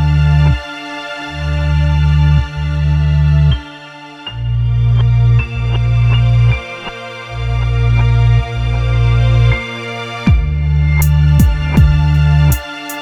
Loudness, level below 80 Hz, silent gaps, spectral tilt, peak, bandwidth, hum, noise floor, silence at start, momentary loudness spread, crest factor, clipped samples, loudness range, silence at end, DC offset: -13 LUFS; -16 dBFS; none; -7 dB/octave; 0 dBFS; 17 kHz; none; -33 dBFS; 0 s; 13 LU; 12 dB; under 0.1%; 2 LU; 0 s; under 0.1%